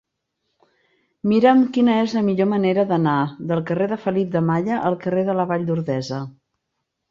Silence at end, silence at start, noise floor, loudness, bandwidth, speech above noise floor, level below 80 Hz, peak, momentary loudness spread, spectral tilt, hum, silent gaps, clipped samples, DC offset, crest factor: 0.8 s; 1.25 s; -77 dBFS; -20 LUFS; 7.4 kHz; 58 dB; -62 dBFS; -4 dBFS; 9 LU; -8 dB/octave; none; none; under 0.1%; under 0.1%; 18 dB